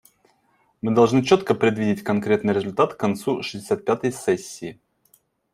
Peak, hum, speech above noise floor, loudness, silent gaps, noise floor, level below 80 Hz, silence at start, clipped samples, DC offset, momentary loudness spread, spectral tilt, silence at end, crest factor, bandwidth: -2 dBFS; none; 43 dB; -22 LUFS; none; -64 dBFS; -62 dBFS; 0.85 s; under 0.1%; under 0.1%; 10 LU; -6 dB/octave; 0.8 s; 20 dB; 15.5 kHz